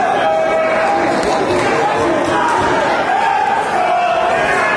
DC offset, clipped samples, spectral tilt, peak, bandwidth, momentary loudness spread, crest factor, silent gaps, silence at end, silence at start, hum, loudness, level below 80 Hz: under 0.1%; under 0.1%; -4 dB/octave; -2 dBFS; 11 kHz; 1 LU; 12 dB; none; 0 s; 0 s; none; -14 LUFS; -44 dBFS